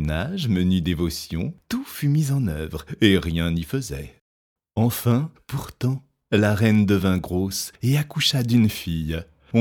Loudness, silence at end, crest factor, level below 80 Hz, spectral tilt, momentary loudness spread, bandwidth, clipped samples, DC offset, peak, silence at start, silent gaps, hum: -23 LUFS; 0 s; 20 dB; -40 dBFS; -6 dB/octave; 12 LU; 20 kHz; under 0.1%; under 0.1%; -2 dBFS; 0 s; 4.21-4.56 s; none